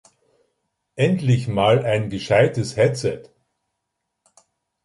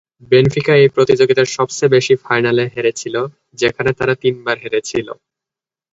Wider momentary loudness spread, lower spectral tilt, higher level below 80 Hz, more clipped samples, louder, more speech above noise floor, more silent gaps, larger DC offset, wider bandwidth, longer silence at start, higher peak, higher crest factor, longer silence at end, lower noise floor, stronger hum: about the same, 9 LU vs 10 LU; first, -6.5 dB/octave vs -5 dB/octave; about the same, -52 dBFS vs -50 dBFS; neither; second, -20 LUFS vs -15 LUFS; second, 60 dB vs 73 dB; neither; neither; first, 11.5 kHz vs 8 kHz; first, 0.95 s vs 0.3 s; about the same, -2 dBFS vs 0 dBFS; about the same, 20 dB vs 16 dB; first, 1.6 s vs 0.8 s; second, -78 dBFS vs -88 dBFS; neither